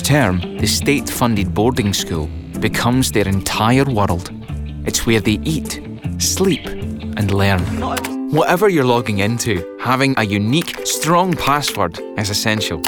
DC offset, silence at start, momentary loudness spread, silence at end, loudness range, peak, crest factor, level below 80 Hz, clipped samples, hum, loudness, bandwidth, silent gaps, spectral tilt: under 0.1%; 0 s; 9 LU; 0 s; 2 LU; -2 dBFS; 14 dB; -34 dBFS; under 0.1%; none; -17 LUFS; over 20 kHz; none; -4.5 dB/octave